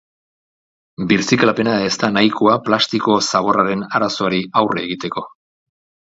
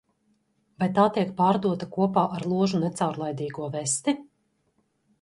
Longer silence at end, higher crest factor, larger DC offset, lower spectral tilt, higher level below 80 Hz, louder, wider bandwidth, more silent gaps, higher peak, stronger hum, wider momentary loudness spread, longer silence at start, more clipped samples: second, 0.85 s vs 1 s; about the same, 18 dB vs 20 dB; neither; about the same, -4.5 dB/octave vs -5.5 dB/octave; first, -56 dBFS vs -66 dBFS; first, -16 LUFS vs -26 LUFS; second, 7.8 kHz vs 11.5 kHz; neither; first, 0 dBFS vs -6 dBFS; neither; about the same, 9 LU vs 9 LU; first, 1 s vs 0.8 s; neither